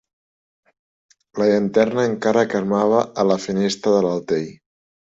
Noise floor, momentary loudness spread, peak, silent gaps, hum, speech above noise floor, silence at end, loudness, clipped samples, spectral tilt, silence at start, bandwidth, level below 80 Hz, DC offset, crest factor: under -90 dBFS; 6 LU; -4 dBFS; none; none; over 72 dB; 0.6 s; -19 LUFS; under 0.1%; -6 dB/octave; 1.35 s; 8 kHz; -60 dBFS; under 0.1%; 18 dB